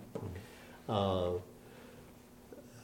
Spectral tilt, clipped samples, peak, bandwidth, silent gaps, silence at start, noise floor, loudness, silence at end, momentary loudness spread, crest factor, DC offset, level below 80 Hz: -6.5 dB/octave; under 0.1%; -18 dBFS; 17 kHz; none; 0 s; -57 dBFS; -37 LUFS; 0 s; 22 LU; 22 dB; under 0.1%; -64 dBFS